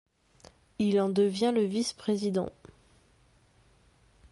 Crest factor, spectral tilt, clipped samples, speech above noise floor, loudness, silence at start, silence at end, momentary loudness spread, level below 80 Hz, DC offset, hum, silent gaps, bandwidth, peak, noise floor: 16 dB; -6 dB/octave; under 0.1%; 36 dB; -29 LUFS; 0.8 s; 1.8 s; 7 LU; -66 dBFS; under 0.1%; none; none; 11.5 kHz; -16 dBFS; -64 dBFS